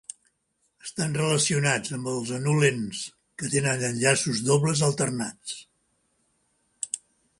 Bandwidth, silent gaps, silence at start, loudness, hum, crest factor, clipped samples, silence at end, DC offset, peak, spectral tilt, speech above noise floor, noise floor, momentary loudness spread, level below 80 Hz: 11.5 kHz; none; 0.85 s; -25 LUFS; none; 20 dB; under 0.1%; 0.45 s; under 0.1%; -6 dBFS; -4 dB/octave; 48 dB; -73 dBFS; 15 LU; -62 dBFS